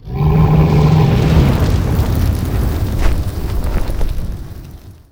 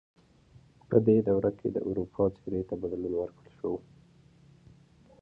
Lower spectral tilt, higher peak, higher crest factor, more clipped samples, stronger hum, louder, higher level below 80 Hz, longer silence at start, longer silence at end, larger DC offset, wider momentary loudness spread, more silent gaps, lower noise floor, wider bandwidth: second, -7.5 dB/octave vs -11.5 dB/octave; first, 0 dBFS vs -8 dBFS; second, 14 dB vs 22 dB; neither; neither; first, -15 LUFS vs -30 LUFS; first, -18 dBFS vs -58 dBFS; second, 0.05 s vs 0.9 s; second, 0.2 s vs 1.4 s; neither; about the same, 13 LU vs 12 LU; neither; second, -34 dBFS vs -59 dBFS; first, 17 kHz vs 5 kHz